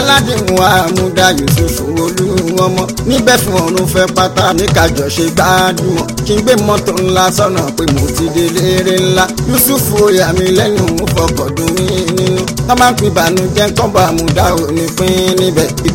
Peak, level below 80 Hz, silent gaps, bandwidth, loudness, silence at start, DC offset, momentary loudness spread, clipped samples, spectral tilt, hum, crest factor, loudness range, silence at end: 0 dBFS; -28 dBFS; none; over 20 kHz; -11 LUFS; 0 s; under 0.1%; 5 LU; 0.3%; -4.5 dB/octave; none; 10 dB; 1 LU; 0 s